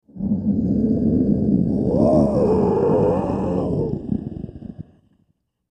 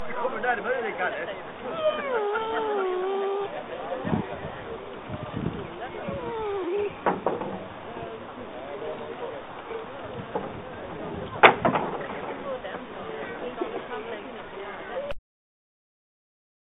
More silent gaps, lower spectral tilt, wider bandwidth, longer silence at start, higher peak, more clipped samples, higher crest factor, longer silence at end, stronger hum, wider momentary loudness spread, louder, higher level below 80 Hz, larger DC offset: neither; first, -11 dB/octave vs -3 dB/octave; first, 9 kHz vs 4 kHz; first, 0.15 s vs 0 s; second, -4 dBFS vs 0 dBFS; neither; second, 16 dB vs 30 dB; second, 0.9 s vs 1.45 s; neither; about the same, 12 LU vs 11 LU; first, -19 LUFS vs -29 LUFS; first, -38 dBFS vs -56 dBFS; neither